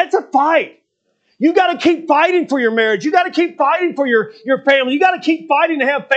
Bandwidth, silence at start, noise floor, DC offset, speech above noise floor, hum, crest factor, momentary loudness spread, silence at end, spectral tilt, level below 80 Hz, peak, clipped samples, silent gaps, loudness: 8.2 kHz; 0 s; -65 dBFS; under 0.1%; 50 dB; none; 14 dB; 4 LU; 0 s; -4.5 dB/octave; -70 dBFS; 0 dBFS; under 0.1%; none; -15 LUFS